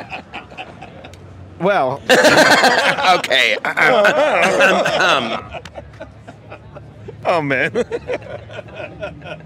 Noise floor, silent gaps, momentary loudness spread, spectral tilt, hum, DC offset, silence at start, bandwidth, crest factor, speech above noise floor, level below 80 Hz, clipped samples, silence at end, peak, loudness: -37 dBFS; none; 22 LU; -3 dB/octave; none; under 0.1%; 0 s; 16 kHz; 18 dB; 22 dB; -50 dBFS; under 0.1%; 0.05 s; 0 dBFS; -14 LUFS